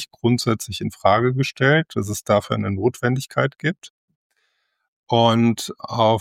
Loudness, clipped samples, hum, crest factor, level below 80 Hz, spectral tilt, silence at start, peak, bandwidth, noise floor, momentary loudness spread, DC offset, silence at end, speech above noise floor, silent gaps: -20 LUFS; under 0.1%; none; 18 dB; -58 dBFS; -5.5 dB/octave; 0 s; -2 dBFS; 16.5 kHz; -70 dBFS; 9 LU; under 0.1%; 0 s; 50 dB; 3.90-4.08 s, 4.15-4.30 s, 4.88-5.04 s